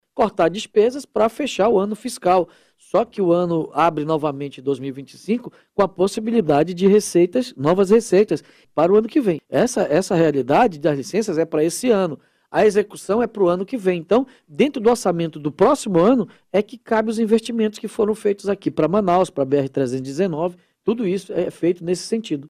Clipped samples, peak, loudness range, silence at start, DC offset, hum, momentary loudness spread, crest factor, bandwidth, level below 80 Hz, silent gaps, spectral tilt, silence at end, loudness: under 0.1%; -4 dBFS; 3 LU; 0.15 s; under 0.1%; none; 9 LU; 14 dB; 14.5 kHz; -56 dBFS; none; -6 dB/octave; 0.05 s; -20 LUFS